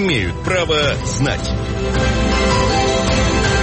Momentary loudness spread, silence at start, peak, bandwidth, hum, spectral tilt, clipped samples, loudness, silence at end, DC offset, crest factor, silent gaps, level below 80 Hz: 5 LU; 0 s; -4 dBFS; 8.8 kHz; none; -4.5 dB/octave; under 0.1%; -17 LUFS; 0 s; under 0.1%; 12 dB; none; -24 dBFS